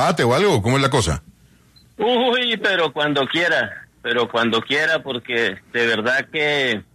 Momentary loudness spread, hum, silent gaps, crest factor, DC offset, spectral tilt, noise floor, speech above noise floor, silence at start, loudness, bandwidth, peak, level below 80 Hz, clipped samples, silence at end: 6 LU; none; none; 16 dB; under 0.1%; -4.5 dB/octave; -52 dBFS; 33 dB; 0 s; -19 LUFS; 13.5 kHz; -4 dBFS; -44 dBFS; under 0.1%; 0.15 s